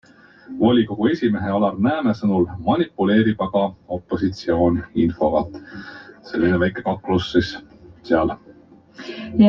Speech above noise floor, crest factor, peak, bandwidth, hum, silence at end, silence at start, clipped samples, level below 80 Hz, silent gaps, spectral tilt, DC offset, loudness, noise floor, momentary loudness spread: 28 dB; 18 dB; -2 dBFS; 7 kHz; none; 0 s; 0.5 s; under 0.1%; -48 dBFS; none; -8 dB/octave; under 0.1%; -20 LUFS; -47 dBFS; 18 LU